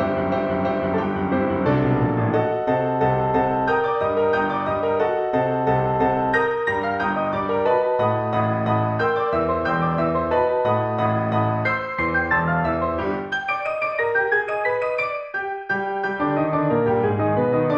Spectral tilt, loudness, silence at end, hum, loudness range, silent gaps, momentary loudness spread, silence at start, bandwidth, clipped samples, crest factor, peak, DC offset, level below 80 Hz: -8.5 dB/octave; -21 LUFS; 0 s; none; 2 LU; none; 4 LU; 0 s; 7.6 kHz; under 0.1%; 14 dB; -6 dBFS; under 0.1%; -48 dBFS